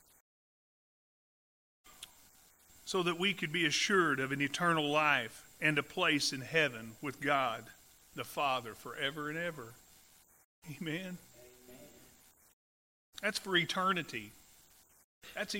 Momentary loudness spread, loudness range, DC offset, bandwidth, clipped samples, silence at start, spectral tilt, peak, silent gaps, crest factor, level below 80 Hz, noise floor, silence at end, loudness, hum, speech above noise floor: 20 LU; 13 LU; under 0.1%; 16 kHz; under 0.1%; 1.85 s; -3.5 dB/octave; -14 dBFS; 10.44-10.62 s, 12.53-13.13 s, 15.04-15.22 s; 22 dB; -72 dBFS; -64 dBFS; 0 s; -33 LUFS; none; 30 dB